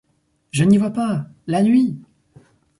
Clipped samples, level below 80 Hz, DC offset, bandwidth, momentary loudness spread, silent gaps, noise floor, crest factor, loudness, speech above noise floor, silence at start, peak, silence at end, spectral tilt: under 0.1%; -58 dBFS; under 0.1%; 11.5 kHz; 11 LU; none; -65 dBFS; 16 dB; -18 LUFS; 48 dB; 0.55 s; -4 dBFS; 0.8 s; -7 dB/octave